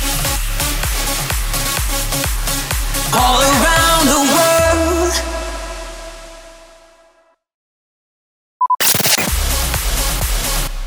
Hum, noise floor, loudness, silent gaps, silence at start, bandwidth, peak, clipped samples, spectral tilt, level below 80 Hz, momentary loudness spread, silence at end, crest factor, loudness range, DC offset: none; -54 dBFS; -15 LUFS; 7.54-8.60 s; 0 s; over 20 kHz; -2 dBFS; under 0.1%; -2.5 dB/octave; -24 dBFS; 13 LU; 0 s; 16 dB; 12 LU; under 0.1%